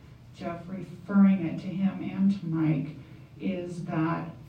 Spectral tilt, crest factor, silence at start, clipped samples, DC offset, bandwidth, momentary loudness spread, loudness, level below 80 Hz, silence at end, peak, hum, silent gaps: -9 dB/octave; 16 dB; 0.05 s; under 0.1%; under 0.1%; 6.6 kHz; 17 LU; -28 LUFS; -60 dBFS; 0 s; -12 dBFS; none; none